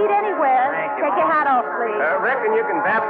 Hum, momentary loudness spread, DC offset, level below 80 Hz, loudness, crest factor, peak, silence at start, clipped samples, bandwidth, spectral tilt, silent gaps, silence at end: none; 4 LU; under 0.1%; -74 dBFS; -19 LUFS; 10 dB; -8 dBFS; 0 s; under 0.1%; 4.8 kHz; -8 dB/octave; none; 0 s